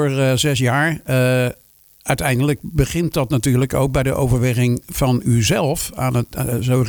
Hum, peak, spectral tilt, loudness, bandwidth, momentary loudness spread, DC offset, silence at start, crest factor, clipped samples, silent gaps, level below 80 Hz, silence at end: none; -2 dBFS; -5.5 dB/octave; -18 LUFS; over 20 kHz; 5 LU; under 0.1%; 0 s; 16 dB; under 0.1%; none; -34 dBFS; 0 s